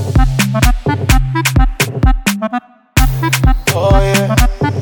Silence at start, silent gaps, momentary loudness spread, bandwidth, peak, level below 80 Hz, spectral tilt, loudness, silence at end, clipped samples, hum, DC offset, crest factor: 0 s; none; 4 LU; 19.5 kHz; 0 dBFS; -16 dBFS; -5 dB/octave; -13 LUFS; 0 s; under 0.1%; none; under 0.1%; 12 dB